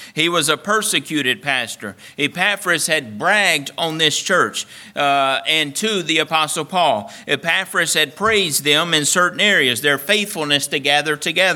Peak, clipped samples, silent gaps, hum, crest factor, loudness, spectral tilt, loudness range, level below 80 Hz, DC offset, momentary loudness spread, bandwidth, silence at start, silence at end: 0 dBFS; under 0.1%; none; none; 18 dB; -17 LUFS; -2 dB/octave; 3 LU; -62 dBFS; under 0.1%; 7 LU; 19 kHz; 0 s; 0 s